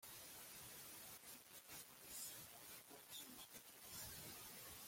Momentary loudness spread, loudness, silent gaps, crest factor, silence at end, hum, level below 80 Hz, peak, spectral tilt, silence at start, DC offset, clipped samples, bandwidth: 5 LU; -55 LUFS; none; 20 dB; 0 s; none; -80 dBFS; -38 dBFS; -1 dB/octave; 0 s; under 0.1%; under 0.1%; 16.5 kHz